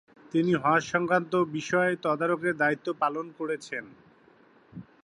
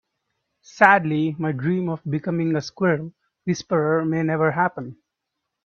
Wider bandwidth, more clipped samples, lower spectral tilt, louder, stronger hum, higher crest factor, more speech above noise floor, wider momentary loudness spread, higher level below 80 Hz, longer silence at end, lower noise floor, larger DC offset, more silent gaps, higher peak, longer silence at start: first, 10.5 kHz vs 7.2 kHz; neither; about the same, -6 dB/octave vs -7 dB/octave; second, -27 LUFS vs -21 LUFS; neither; about the same, 18 dB vs 22 dB; second, 32 dB vs 60 dB; about the same, 10 LU vs 12 LU; second, -70 dBFS vs -64 dBFS; second, 0.2 s vs 0.75 s; second, -59 dBFS vs -81 dBFS; neither; neither; second, -10 dBFS vs 0 dBFS; second, 0.35 s vs 0.75 s